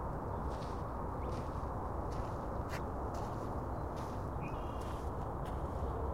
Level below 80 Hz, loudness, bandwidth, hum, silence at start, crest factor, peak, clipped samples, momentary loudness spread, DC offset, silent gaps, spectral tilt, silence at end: -44 dBFS; -41 LUFS; 16 kHz; none; 0 s; 12 dB; -26 dBFS; under 0.1%; 1 LU; 0.2%; none; -7.5 dB/octave; 0 s